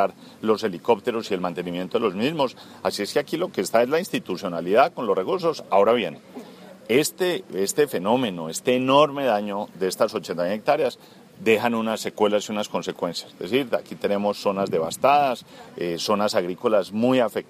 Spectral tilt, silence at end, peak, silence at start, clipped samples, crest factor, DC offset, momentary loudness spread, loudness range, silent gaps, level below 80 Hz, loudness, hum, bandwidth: -4.5 dB/octave; 0.05 s; -4 dBFS; 0 s; under 0.1%; 20 dB; under 0.1%; 9 LU; 3 LU; none; -68 dBFS; -23 LUFS; none; 15.5 kHz